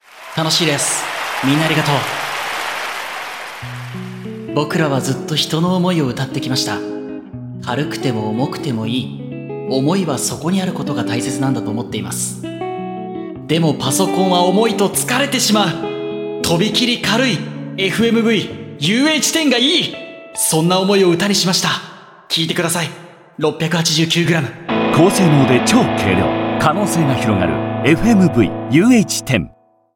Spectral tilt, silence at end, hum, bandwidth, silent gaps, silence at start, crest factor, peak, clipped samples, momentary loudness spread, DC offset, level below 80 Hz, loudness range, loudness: -4.5 dB/octave; 0.45 s; none; 17 kHz; none; 0.15 s; 16 dB; 0 dBFS; under 0.1%; 14 LU; under 0.1%; -48 dBFS; 6 LU; -16 LUFS